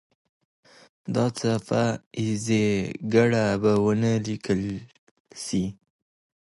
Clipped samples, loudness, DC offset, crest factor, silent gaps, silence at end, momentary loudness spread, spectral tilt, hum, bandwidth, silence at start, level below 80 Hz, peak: under 0.1%; -25 LUFS; under 0.1%; 18 dB; 2.06-2.11 s, 4.99-5.25 s; 0.7 s; 10 LU; -6 dB/octave; none; 11.5 kHz; 1.05 s; -56 dBFS; -6 dBFS